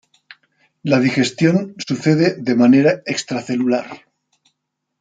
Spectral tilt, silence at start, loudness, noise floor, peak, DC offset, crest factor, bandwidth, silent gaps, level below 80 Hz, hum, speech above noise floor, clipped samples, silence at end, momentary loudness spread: -6 dB/octave; 0.85 s; -17 LUFS; -75 dBFS; -2 dBFS; under 0.1%; 16 dB; 9.2 kHz; none; -62 dBFS; none; 59 dB; under 0.1%; 1.05 s; 10 LU